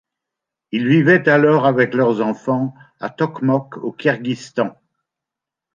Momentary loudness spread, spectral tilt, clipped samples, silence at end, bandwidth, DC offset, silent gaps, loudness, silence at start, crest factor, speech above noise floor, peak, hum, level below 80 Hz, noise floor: 13 LU; -7.5 dB/octave; under 0.1%; 1.05 s; 7.4 kHz; under 0.1%; none; -17 LUFS; 0.75 s; 16 dB; 68 dB; -2 dBFS; none; -62 dBFS; -85 dBFS